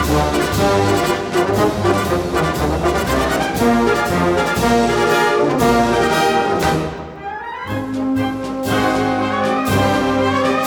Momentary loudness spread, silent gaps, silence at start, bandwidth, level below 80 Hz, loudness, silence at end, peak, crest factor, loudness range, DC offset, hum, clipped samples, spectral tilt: 7 LU; none; 0 s; over 20 kHz; -32 dBFS; -16 LUFS; 0 s; -2 dBFS; 14 dB; 4 LU; under 0.1%; none; under 0.1%; -5 dB/octave